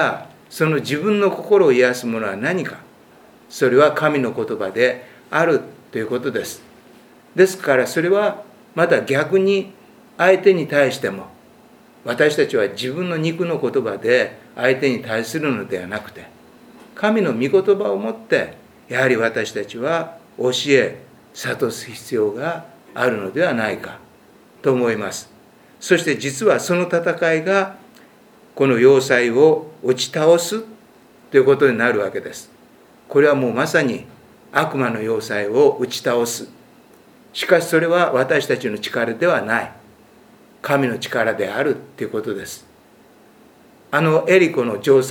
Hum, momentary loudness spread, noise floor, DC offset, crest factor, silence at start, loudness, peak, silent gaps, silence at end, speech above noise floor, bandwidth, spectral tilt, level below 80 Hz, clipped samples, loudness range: none; 14 LU; -49 dBFS; under 0.1%; 20 dB; 0 s; -18 LUFS; 0 dBFS; none; 0 s; 32 dB; 18.5 kHz; -5 dB/octave; -66 dBFS; under 0.1%; 5 LU